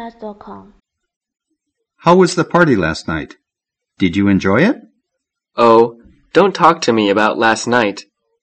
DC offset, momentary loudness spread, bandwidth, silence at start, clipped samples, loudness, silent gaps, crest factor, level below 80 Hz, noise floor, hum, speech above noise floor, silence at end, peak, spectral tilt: under 0.1%; 18 LU; 8.8 kHz; 0 s; 0.2%; -14 LUFS; 1.16-1.21 s; 16 dB; -48 dBFS; -81 dBFS; none; 68 dB; 0.4 s; 0 dBFS; -5.5 dB/octave